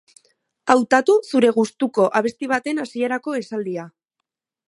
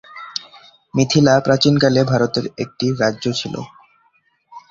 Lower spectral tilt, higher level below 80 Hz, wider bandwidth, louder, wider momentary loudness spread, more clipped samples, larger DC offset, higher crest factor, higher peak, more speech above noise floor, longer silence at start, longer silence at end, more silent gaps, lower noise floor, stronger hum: about the same, -5 dB/octave vs -5.5 dB/octave; second, -70 dBFS vs -52 dBFS; first, 11.5 kHz vs 7.6 kHz; second, -20 LUFS vs -17 LUFS; second, 11 LU vs 15 LU; neither; neither; about the same, 20 dB vs 18 dB; about the same, 0 dBFS vs -2 dBFS; first, 62 dB vs 45 dB; first, 0.65 s vs 0.1 s; first, 0.8 s vs 0.1 s; neither; first, -81 dBFS vs -61 dBFS; neither